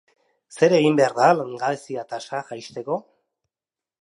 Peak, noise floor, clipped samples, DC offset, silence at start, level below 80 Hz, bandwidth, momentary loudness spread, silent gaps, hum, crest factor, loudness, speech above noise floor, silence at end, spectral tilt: -4 dBFS; under -90 dBFS; under 0.1%; under 0.1%; 0.55 s; -76 dBFS; 11.5 kHz; 14 LU; none; none; 20 dB; -21 LUFS; over 69 dB; 1 s; -5.5 dB/octave